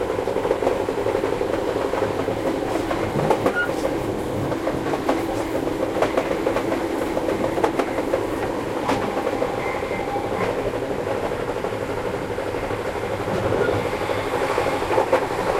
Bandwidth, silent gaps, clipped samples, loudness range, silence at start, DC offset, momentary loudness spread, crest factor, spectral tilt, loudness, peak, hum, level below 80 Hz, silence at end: 16.5 kHz; none; under 0.1%; 2 LU; 0 s; under 0.1%; 5 LU; 18 dB; -5.5 dB/octave; -23 LUFS; -4 dBFS; none; -42 dBFS; 0 s